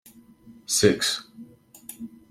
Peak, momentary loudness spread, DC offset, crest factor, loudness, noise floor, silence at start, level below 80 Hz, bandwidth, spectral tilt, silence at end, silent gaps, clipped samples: -4 dBFS; 23 LU; under 0.1%; 24 dB; -22 LUFS; -51 dBFS; 0.45 s; -60 dBFS; 16.5 kHz; -3 dB/octave; 0.25 s; none; under 0.1%